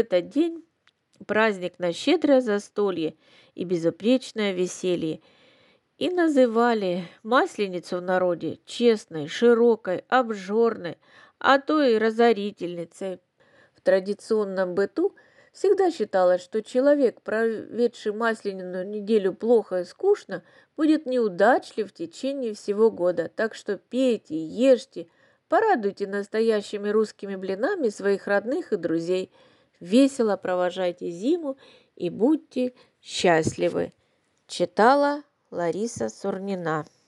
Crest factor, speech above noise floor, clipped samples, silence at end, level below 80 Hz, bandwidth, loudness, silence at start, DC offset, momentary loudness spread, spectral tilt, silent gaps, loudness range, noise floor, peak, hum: 20 dB; 45 dB; under 0.1%; 0.25 s; -72 dBFS; 11.5 kHz; -24 LUFS; 0 s; under 0.1%; 12 LU; -5.5 dB/octave; none; 3 LU; -68 dBFS; -4 dBFS; none